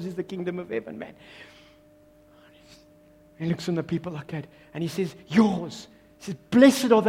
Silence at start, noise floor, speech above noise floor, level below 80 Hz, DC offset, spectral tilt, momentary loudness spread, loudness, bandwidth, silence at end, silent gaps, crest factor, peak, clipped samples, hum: 0 s; -56 dBFS; 31 dB; -62 dBFS; under 0.1%; -6 dB/octave; 24 LU; -25 LUFS; 16 kHz; 0 s; none; 22 dB; -4 dBFS; under 0.1%; none